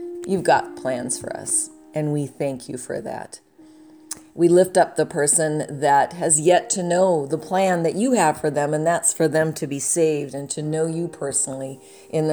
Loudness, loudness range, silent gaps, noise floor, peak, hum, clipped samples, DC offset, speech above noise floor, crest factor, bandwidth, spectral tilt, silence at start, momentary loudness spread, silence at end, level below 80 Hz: -21 LUFS; 7 LU; none; -48 dBFS; -4 dBFS; none; under 0.1%; under 0.1%; 27 dB; 18 dB; over 20 kHz; -4 dB/octave; 0 s; 12 LU; 0 s; -64 dBFS